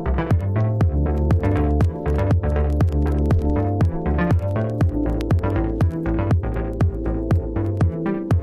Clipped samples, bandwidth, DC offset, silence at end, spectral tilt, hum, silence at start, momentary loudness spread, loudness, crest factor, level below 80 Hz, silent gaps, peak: under 0.1%; 6.8 kHz; under 0.1%; 0 s; -9.5 dB/octave; none; 0 s; 3 LU; -21 LUFS; 12 dB; -24 dBFS; none; -6 dBFS